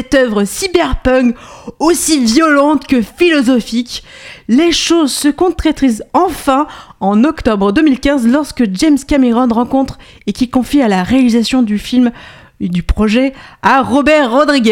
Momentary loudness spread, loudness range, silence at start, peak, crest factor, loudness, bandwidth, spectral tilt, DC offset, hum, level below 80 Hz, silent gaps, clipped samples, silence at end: 9 LU; 1 LU; 0 s; 0 dBFS; 12 dB; -12 LUFS; 16.5 kHz; -4.5 dB/octave; under 0.1%; none; -30 dBFS; none; under 0.1%; 0 s